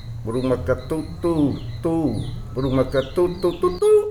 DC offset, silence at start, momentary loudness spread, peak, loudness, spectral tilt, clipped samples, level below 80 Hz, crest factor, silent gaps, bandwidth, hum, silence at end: under 0.1%; 0 s; 7 LU; -8 dBFS; -22 LUFS; -7.5 dB/octave; under 0.1%; -36 dBFS; 14 dB; none; 14 kHz; none; 0 s